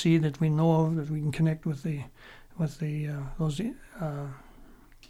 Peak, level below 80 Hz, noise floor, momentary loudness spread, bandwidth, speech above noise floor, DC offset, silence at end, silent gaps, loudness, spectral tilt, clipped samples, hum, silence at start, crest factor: -14 dBFS; -50 dBFS; -52 dBFS; 14 LU; 11.5 kHz; 24 dB; under 0.1%; 0.05 s; none; -29 LUFS; -8 dB/octave; under 0.1%; none; 0 s; 16 dB